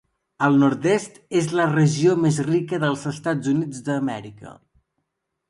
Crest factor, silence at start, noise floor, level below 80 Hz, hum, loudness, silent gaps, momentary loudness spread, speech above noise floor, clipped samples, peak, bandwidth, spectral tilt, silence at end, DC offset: 16 dB; 0.4 s; -78 dBFS; -62 dBFS; none; -21 LUFS; none; 8 LU; 57 dB; under 0.1%; -6 dBFS; 11.5 kHz; -6.5 dB/octave; 0.95 s; under 0.1%